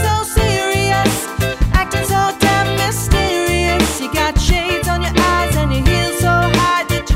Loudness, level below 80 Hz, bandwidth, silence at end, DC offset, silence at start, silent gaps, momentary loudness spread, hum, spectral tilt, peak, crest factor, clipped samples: -15 LUFS; -22 dBFS; 16.5 kHz; 0 s; under 0.1%; 0 s; none; 3 LU; none; -4.5 dB/octave; 0 dBFS; 14 dB; under 0.1%